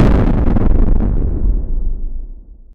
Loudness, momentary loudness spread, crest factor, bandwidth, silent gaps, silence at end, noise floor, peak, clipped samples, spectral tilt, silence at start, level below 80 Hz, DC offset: -17 LUFS; 16 LU; 12 dB; 3.9 kHz; none; 0.2 s; -32 dBFS; 0 dBFS; under 0.1%; -10 dB/octave; 0 s; -14 dBFS; under 0.1%